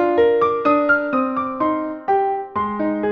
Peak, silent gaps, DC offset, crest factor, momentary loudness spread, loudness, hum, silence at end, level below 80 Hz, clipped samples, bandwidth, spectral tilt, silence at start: -4 dBFS; none; under 0.1%; 14 dB; 7 LU; -19 LUFS; none; 0 s; -54 dBFS; under 0.1%; 5.6 kHz; -8 dB/octave; 0 s